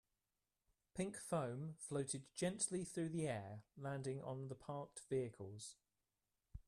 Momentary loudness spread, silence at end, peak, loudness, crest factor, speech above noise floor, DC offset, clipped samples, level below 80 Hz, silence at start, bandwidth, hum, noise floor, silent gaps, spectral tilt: 11 LU; 0.05 s; -28 dBFS; -46 LUFS; 20 dB; over 44 dB; under 0.1%; under 0.1%; -72 dBFS; 0.95 s; 13.5 kHz; none; under -90 dBFS; none; -5 dB/octave